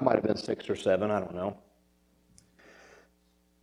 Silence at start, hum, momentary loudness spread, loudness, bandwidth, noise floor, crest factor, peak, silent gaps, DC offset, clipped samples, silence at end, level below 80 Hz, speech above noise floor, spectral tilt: 0 s; none; 10 LU; -30 LUFS; 11.5 kHz; -68 dBFS; 24 dB; -8 dBFS; none; under 0.1%; under 0.1%; 2.05 s; -66 dBFS; 39 dB; -6.5 dB/octave